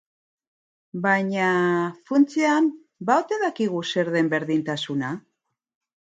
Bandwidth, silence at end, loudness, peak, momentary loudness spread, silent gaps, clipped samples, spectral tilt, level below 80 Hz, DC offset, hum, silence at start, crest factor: 9 kHz; 1 s; -23 LUFS; -4 dBFS; 8 LU; none; under 0.1%; -5.5 dB/octave; -74 dBFS; under 0.1%; none; 0.95 s; 20 dB